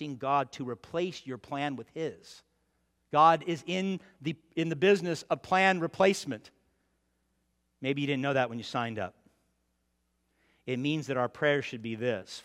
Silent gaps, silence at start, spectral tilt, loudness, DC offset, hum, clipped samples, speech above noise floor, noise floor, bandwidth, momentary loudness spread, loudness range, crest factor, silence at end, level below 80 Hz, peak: none; 0 s; -5.5 dB/octave; -30 LUFS; under 0.1%; none; under 0.1%; 47 dB; -77 dBFS; 14 kHz; 13 LU; 7 LU; 22 dB; 0.05 s; -74 dBFS; -10 dBFS